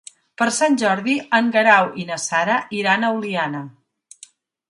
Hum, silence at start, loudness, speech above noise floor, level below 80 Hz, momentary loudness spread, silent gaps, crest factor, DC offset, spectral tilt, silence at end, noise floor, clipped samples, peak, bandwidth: none; 0.4 s; -18 LUFS; 30 dB; -70 dBFS; 10 LU; none; 20 dB; under 0.1%; -3.5 dB/octave; 1 s; -49 dBFS; under 0.1%; 0 dBFS; 11.5 kHz